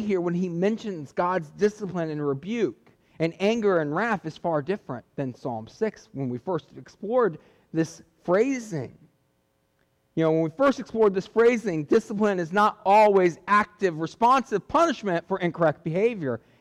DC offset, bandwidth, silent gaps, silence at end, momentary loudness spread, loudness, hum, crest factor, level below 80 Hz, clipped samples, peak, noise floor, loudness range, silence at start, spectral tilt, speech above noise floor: under 0.1%; 12 kHz; none; 0.25 s; 11 LU; -25 LUFS; none; 14 dB; -64 dBFS; under 0.1%; -12 dBFS; -70 dBFS; 8 LU; 0 s; -6.5 dB/octave; 45 dB